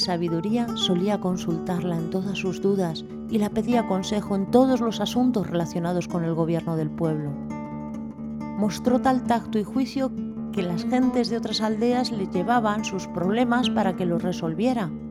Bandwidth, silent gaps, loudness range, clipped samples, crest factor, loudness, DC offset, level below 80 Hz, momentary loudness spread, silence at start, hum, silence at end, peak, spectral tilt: 14.5 kHz; none; 3 LU; under 0.1%; 18 dB; -25 LUFS; under 0.1%; -54 dBFS; 8 LU; 0 s; none; 0 s; -6 dBFS; -6 dB/octave